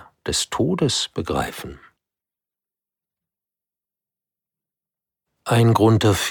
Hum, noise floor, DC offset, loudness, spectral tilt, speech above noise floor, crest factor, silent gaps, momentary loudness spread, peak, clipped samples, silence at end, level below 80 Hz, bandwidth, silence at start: 50 Hz at -65 dBFS; -90 dBFS; under 0.1%; -20 LUFS; -5 dB/octave; 71 dB; 20 dB; none; 17 LU; -4 dBFS; under 0.1%; 0 s; -48 dBFS; 19 kHz; 0.25 s